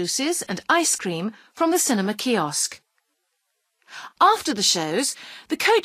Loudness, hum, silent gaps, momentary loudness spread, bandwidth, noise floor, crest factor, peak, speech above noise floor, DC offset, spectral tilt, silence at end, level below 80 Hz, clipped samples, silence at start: -21 LUFS; none; none; 13 LU; 15.5 kHz; -75 dBFS; 18 dB; -4 dBFS; 52 dB; under 0.1%; -2.5 dB/octave; 0 s; -70 dBFS; under 0.1%; 0 s